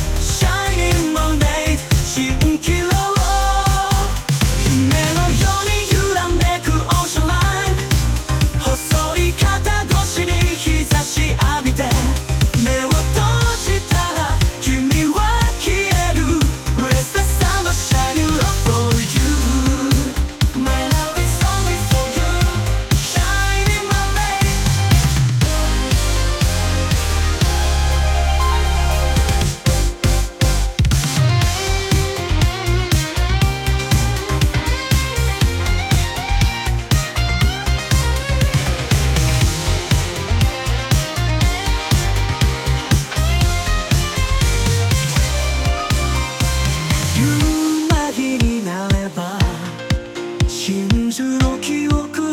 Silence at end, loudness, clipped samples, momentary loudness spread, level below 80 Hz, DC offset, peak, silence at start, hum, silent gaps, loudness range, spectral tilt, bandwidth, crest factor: 0 s; -17 LUFS; under 0.1%; 3 LU; -20 dBFS; under 0.1%; -2 dBFS; 0 s; none; none; 2 LU; -4.5 dB/octave; 18 kHz; 14 dB